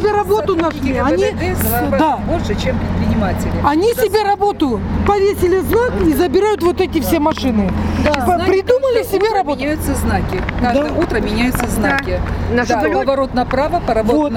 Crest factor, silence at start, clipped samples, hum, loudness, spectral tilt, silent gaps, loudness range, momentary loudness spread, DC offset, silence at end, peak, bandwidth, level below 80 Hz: 14 dB; 0 s; under 0.1%; none; -16 LUFS; -6 dB/octave; none; 2 LU; 4 LU; under 0.1%; 0 s; 0 dBFS; 17.5 kHz; -28 dBFS